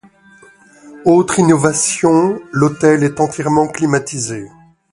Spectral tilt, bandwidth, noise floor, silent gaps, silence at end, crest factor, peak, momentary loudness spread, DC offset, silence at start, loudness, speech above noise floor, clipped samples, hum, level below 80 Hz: -5.5 dB/octave; 11.5 kHz; -45 dBFS; none; 0.45 s; 14 dB; 0 dBFS; 8 LU; under 0.1%; 0.85 s; -14 LUFS; 32 dB; under 0.1%; none; -50 dBFS